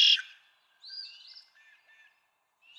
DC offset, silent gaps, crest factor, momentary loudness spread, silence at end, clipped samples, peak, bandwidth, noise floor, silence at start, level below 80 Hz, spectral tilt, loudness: under 0.1%; none; 22 dB; 27 LU; 1.7 s; under 0.1%; -10 dBFS; 13.5 kHz; -74 dBFS; 0 s; under -90 dBFS; 7.5 dB/octave; -27 LUFS